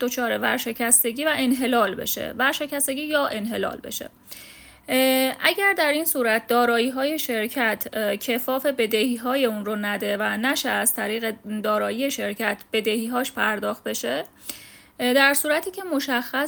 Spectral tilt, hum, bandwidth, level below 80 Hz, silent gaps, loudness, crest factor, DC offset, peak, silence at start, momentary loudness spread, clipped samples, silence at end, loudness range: -2 dB/octave; none; over 20 kHz; -64 dBFS; none; -22 LUFS; 22 dB; under 0.1%; -2 dBFS; 0 s; 10 LU; under 0.1%; 0 s; 4 LU